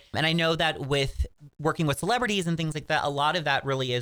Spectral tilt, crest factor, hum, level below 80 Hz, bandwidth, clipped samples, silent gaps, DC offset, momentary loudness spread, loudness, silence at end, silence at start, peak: -4.5 dB/octave; 18 dB; none; -42 dBFS; over 20 kHz; under 0.1%; none; under 0.1%; 7 LU; -26 LUFS; 0 s; 0.15 s; -8 dBFS